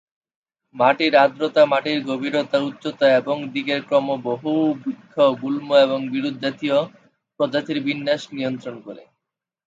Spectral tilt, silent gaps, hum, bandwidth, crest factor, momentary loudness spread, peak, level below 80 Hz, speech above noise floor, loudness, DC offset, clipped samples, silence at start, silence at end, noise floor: -6 dB/octave; none; none; 7.8 kHz; 18 dB; 10 LU; -2 dBFS; -72 dBFS; 64 dB; -20 LUFS; under 0.1%; under 0.1%; 0.75 s; 0.7 s; -84 dBFS